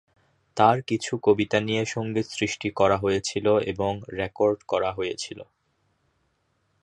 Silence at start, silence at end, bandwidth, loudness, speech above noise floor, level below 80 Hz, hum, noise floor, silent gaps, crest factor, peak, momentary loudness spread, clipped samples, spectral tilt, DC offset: 0.55 s; 1.4 s; 11 kHz; -25 LUFS; 47 dB; -54 dBFS; none; -71 dBFS; none; 22 dB; -4 dBFS; 10 LU; under 0.1%; -5 dB/octave; under 0.1%